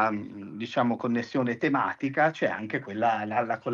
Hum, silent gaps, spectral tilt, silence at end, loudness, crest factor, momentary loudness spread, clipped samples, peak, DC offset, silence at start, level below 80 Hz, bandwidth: none; none; -7 dB/octave; 0 s; -28 LUFS; 18 dB; 7 LU; under 0.1%; -10 dBFS; under 0.1%; 0 s; -78 dBFS; 7.2 kHz